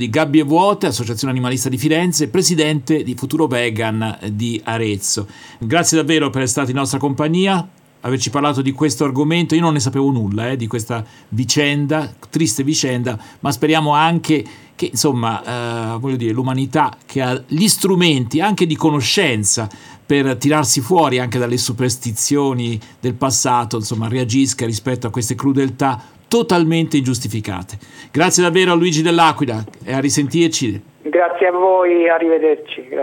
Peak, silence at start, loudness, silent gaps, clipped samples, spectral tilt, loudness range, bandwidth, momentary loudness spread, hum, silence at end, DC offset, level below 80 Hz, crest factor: 0 dBFS; 0 s; -16 LUFS; none; under 0.1%; -4.5 dB/octave; 3 LU; 19.5 kHz; 9 LU; none; 0 s; under 0.1%; -58 dBFS; 16 dB